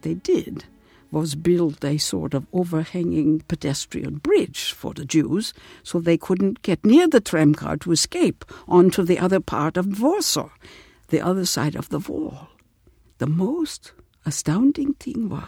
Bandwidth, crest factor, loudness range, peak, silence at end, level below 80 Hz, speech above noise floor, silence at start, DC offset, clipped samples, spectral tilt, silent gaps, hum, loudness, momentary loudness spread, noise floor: 17 kHz; 22 dB; 7 LU; 0 dBFS; 0 s; -52 dBFS; 36 dB; 0.05 s; under 0.1%; under 0.1%; -5 dB/octave; none; none; -21 LUFS; 12 LU; -57 dBFS